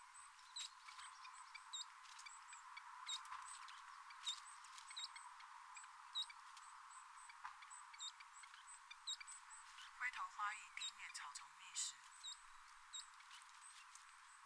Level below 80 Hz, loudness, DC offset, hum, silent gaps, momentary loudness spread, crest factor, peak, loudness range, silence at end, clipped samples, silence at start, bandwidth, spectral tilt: -88 dBFS; -53 LUFS; under 0.1%; none; none; 12 LU; 22 dB; -32 dBFS; 4 LU; 0 s; under 0.1%; 0 s; 11 kHz; 5.5 dB/octave